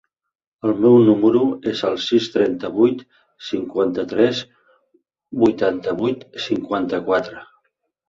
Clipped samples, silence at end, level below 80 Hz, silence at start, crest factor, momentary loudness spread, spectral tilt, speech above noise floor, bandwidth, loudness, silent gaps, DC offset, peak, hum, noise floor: under 0.1%; 0.65 s; -58 dBFS; 0.65 s; 16 dB; 14 LU; -6.5 dB/octave; 51 dB; 7.4 kHz; -19 LUFS; none; under 0.1%; -2 dBFS; none; -69 dBFS